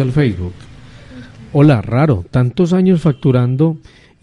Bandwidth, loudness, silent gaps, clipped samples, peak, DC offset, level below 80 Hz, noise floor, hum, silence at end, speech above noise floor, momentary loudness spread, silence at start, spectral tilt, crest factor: 10.5 kHz; -14 LUFS; none; under 0.1%; -2 dBFS; under 0.1%; -42 dBFS; -35 dBFS; none; 0.45 s; 22 dB; 8 LU; 0 s; -9 dB/octave; 12 dB